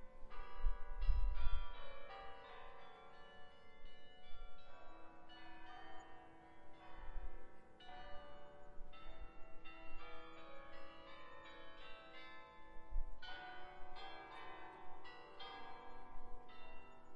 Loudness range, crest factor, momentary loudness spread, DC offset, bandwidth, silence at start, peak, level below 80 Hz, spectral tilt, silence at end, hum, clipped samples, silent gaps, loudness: 10 LU; 22 dB; 13 LU; under 0.1%; 5.4 kHz; 0 s; -22 dBFS; -50 dBFS; -6 dB/octave; 0 s; none; under 0.1%; none; -55 LUFS